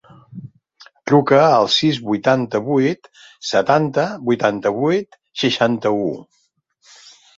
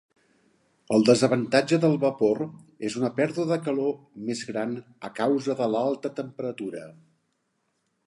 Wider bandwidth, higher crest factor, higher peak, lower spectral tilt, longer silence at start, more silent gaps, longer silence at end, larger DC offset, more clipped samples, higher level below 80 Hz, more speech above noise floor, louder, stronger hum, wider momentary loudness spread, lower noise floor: second, 8 kHz vs 11.5 kHz; about the same, 18 dB vs 20 dB; first, -2 dBFS vs -6 dBFS; about the same, -5.5 dB/octave vs -6 dB/octave; second, 0.3 s vs 0.9 s; neither; about the same, 1.15 s vs 1.15 s; neither; neither; first, -60 dBFS vs -72 dBFS; second, 44 dB vs 50 dB; first, -17 LUFS vs -26 LUFS; neither; first, 18 LU vs 14 LU; second, -61 dBFS vs -74 dBFS